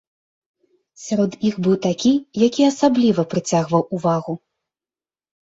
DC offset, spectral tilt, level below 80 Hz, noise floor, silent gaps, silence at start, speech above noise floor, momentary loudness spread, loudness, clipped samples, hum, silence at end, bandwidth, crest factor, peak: under 0.1%; -6 dB/octave; -60 dBFS; under -90 dBFS; none; 1 s; over 72 dB; 8 LU; -19 LUFS; under 0.1%; none; 1.05 s; 8 kHz; 18 dB; -2 dBFS